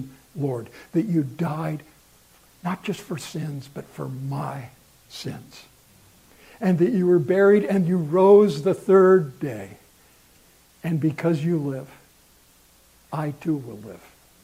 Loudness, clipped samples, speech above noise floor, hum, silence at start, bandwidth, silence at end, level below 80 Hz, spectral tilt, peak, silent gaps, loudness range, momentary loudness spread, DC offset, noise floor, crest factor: -22 LUFS; under 0.1%; 34 dB; none; 0 s; 15.5 kHz; 0.45 s; -64 dBFS; -8 dB/octave; -4 dBFS; none; 14 LU; 20 LU; under 0.1%; -56 dBFS; 20 dB